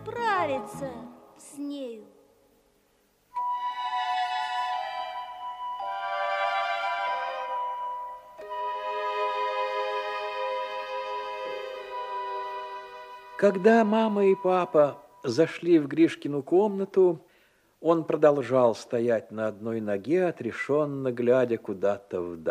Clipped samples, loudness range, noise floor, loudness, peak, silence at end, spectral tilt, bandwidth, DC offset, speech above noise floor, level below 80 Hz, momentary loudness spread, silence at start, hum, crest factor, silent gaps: under 0.1%; 9 LU; -67 dBFS; -27 LUFS; -8 dBFS; 0 s; -6 dB/octave; 13 kHz; under 0.1%; 42 dB; -72 dBFS; 15 LU; 0 s; none; 20 dB; none